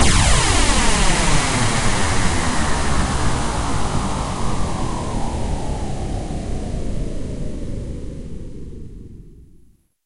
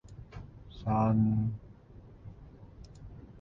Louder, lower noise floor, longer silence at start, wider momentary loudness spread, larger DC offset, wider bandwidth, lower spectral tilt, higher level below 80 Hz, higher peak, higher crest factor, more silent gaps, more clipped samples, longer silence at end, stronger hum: first, -21 LUFS vs -30 LUFS; about the same, -51 dBFS vs -53 dBFS; about the same, 0 s vs 0.1 s; second, 18 LU vs 25 LU; neither; first, 11.5 kHz vs 6 kHz; second, -3.5 dB/octave vs -10.5 dB/octave; first, -24 dBFS vs -52 dBFS; first, -2 dBFS vs -18 dBFS; about the same, 16 dB vs 16 dB; neither; neither; first, 0.7 s vs 0 s; neither